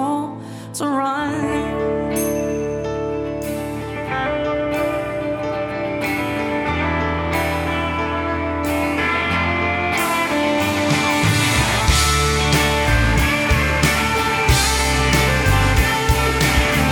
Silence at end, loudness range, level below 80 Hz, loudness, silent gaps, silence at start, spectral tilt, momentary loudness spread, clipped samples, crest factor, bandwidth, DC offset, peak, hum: 0 s; 6 LU; -26 dBFS; -18 LUFS; none; 0 s; -4.5 dB/octave; 8 LU; under 0.1%; 16 dB; over 20 kHz; under 0.1%; -2 dBFS; none